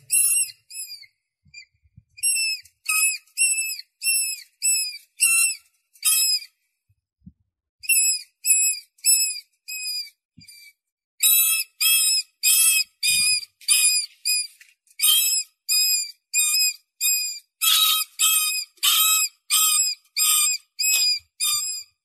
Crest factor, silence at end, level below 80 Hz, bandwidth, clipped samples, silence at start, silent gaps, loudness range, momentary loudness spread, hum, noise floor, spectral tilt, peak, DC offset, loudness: 20 dB; 0.2 s; -74 dBFS; 14.5 kHz; under 0.1%; 0.1 s; 7.69-7.79 s, 10.25-10.29 s, 10.92-10.97 s, 11.04-11.18 s; 4 LU; 11 LU; none; -70 dBFS; 5.5 dB/octave; -4 dBFS; under 0.1%; -19 LUFS